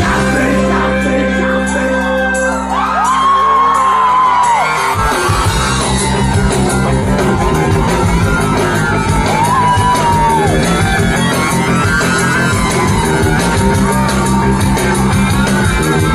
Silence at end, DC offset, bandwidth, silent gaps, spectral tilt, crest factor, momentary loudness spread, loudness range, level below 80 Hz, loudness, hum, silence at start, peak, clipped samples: 0 s; under 0.1%; 13 kHz; none; -5 dB/octave; 12 dB; 3 LU; 2 LU; -24 dBFS; -12 LUFS; none; 0 s; 0 dBFS; under 0.1%